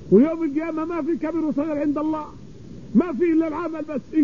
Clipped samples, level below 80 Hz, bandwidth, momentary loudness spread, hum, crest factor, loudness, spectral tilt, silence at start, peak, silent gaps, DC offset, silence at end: under 0.1%; -52 dBFS; 7 kHz; 12 LU; none; 18 dB; -23 LUFS; -9 dB/octave; 0 s; -4 dBFS; none; 0.6%; 0 s